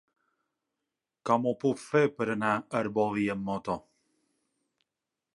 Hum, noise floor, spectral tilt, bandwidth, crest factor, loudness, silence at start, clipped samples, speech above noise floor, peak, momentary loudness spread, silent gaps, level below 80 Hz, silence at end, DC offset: none; -88 dBFS; -6.5 dB/octave; 11.5 kHz; 22 dB; -29 LUFS; 1.25 s; under 0.1%; 59 dB; -10 dBFS; 8 LU; none; -68 dBFS; 1.55 s; under 0.1%